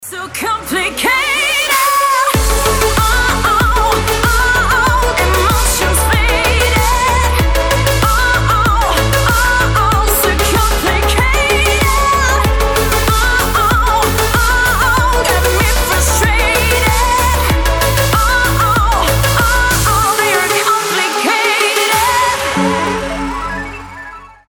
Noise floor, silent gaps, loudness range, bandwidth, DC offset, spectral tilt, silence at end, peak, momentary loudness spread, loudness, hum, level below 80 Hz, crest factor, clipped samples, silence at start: -32 dBFS; none; 0 LU; over 20 kHz; under 0.1%; -3.5 dB/octave; 0.2 s; 0 dBFS; 3 LU; -12 LUFS; none; -18 dBFS; 12 dB; under 0.1%; 0 s